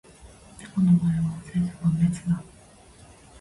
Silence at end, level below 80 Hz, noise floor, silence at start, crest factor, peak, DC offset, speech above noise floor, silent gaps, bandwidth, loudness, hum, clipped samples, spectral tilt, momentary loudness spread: 1 s; -50 dBFS; -51 dBFS; 0.25 s; 16 dB; -10 dBFS; under 0.1%; 28 dB; none; 11.5 kHz; -25 LUFS; none; under 0.1%; -8 dB/octave; 10 LU